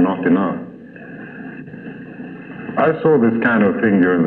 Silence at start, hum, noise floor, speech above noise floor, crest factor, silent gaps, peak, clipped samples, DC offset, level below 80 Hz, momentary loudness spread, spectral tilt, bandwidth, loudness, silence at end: 0 s; none; -36 dBFS; 21 dB; 14 dB; none; -4 dBFS; under 0.1%; under 0.1%; -58 dBFS; 19 LU; -10.5 dB/octave; 4.2 kHz; -16 LUFS; 0 s